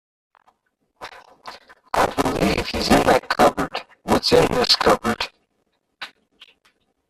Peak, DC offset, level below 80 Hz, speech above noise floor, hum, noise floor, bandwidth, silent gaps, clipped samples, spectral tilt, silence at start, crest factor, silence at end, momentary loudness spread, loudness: -2 dBFS; under 0.1%; -42 dBFS; 53 dB; none; -70 dBFS; 15 kHz; none; under 0.1%; -4 dB/octave; 1 s; 20 dB; 1 s; 24 LU; -19 LUFS